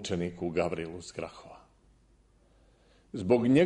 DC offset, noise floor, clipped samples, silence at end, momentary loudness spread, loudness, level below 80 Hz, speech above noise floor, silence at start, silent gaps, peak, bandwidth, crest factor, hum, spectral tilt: under 0.1%; -64 dBFS; under 0.1%; 0 s; 18 LU; -32 LUFS; -60 dBFS; 35 dB; 0 s; none; -12 dBFS; 10.5 kHz; 20 dB; none; -6.5 dB/octave